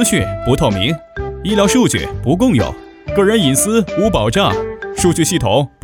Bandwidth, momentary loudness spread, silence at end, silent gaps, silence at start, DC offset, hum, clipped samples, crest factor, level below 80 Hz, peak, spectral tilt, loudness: over 20 kHz; 10 LU; 0.15 s; none; 0 s; under 0.1%; none; under 0.1%; 14 dB; -32 dBFS; 0 dBFS; -4.5 dB/octave; -15 LUFS